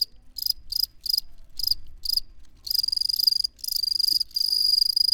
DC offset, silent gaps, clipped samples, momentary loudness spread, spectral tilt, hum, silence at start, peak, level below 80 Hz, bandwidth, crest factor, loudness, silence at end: under 0.1%; none; under 0.1%; 9 LU; 2 dB/octave; none; 0 s; -8 dBFS; -48 dBFS; over 20 kHz; 18 dB; -23 LUFS; 0 s